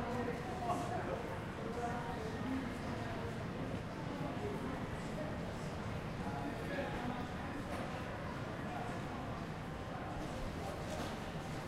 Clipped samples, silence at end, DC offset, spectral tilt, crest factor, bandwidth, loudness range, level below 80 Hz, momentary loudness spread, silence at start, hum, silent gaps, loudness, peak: under 0.1%; 0 s; under 0.1%; -6 dB/octave; 16 dB; 16 kHz; 2 LU; -54 dBFS; 3 LU; 0 s; none; none; -42 LUFS; -26 dBFS